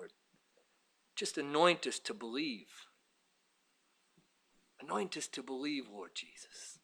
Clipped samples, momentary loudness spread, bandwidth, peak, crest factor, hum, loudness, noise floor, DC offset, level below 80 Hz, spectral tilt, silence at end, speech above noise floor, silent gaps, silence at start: under 0.1%; 20 LU; 20 kHz; -14 dBFS; 26 dB; none; -37 LUFS; -77 dBFS; under 0.1%; under -90 dBFS; -3 dB/octave; 0.1 s; 38 dB; none; 0 s